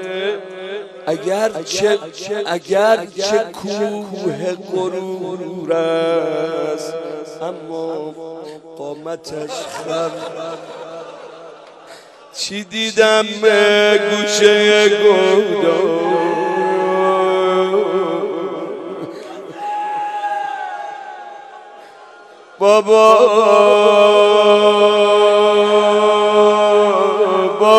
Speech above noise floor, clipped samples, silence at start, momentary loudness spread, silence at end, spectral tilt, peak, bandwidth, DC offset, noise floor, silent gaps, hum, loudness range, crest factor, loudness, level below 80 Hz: 26 dB; under 0.1%; 0 s; 18 LU; 0 s; -3.5 dB/octave; 0 dBFS; 12.5 kHz; under 0.1%; -41 dBFS; none; none; 15 LU; 16 dB; -14 LUFS; -66 dBFS